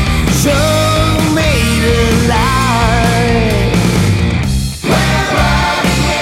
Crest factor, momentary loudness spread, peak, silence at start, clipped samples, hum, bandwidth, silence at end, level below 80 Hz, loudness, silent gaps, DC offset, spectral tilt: 10 dB; 2 LU; 0 dBFS; 0 s; under 0.1%; none; 16.5 kHz; 0 s; -20 dBFS; -12 LUFS; none; under 0.1%; -5 dB/octave